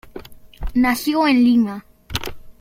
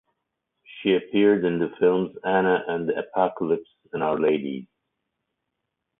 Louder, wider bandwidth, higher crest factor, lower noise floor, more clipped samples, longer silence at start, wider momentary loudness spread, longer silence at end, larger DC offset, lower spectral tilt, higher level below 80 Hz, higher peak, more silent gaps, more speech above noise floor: first, -18 LUFS vs -24 LUFS; first, 16.5 kHz vs 3.9 kHz; about the same, 18 dB vs 18 dB; second, -38 dBFS vs -81 dBFS; neither; second, 0.05 s vs 0.7 s; first, 21 LU vs 8 LU; second, 0.1 s vs 1.35 s; neither; second, -4.5 dB/octave vs -10.5 dB/octave; first, -36 dBFS vs -64 dBFS; first, -2 dBFS vs -6 dBFS; neither; second, 22 dB vs 58 dB